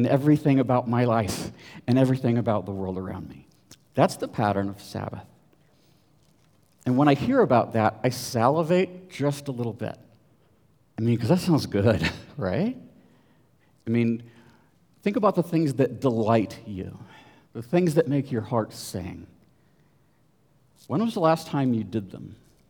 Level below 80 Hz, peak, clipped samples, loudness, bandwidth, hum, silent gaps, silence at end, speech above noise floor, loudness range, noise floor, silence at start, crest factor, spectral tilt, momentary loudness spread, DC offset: -60 dBFS; -4 dBFS; under 0.1%; -25 LUFS; over 20 kHz; none; none; 0.35 s; 40 dB; 6 LU; -64 dBFS; 0 s; 22 dB; -7 dB/octave; 16 LU; under 0.1%